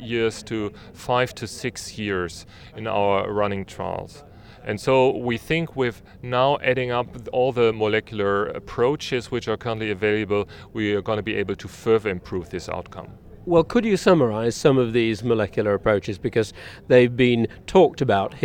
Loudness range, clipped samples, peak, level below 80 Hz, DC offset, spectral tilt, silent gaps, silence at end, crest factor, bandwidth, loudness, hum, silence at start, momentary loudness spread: 5 LU; under 0.1%; 0 dBFS; -48 dBFS; under 0.1%; -6 dB/octave; none; 0 s; 22 dB; 16.5 kHz; -22 LUFS; none; 0 s; 13 LU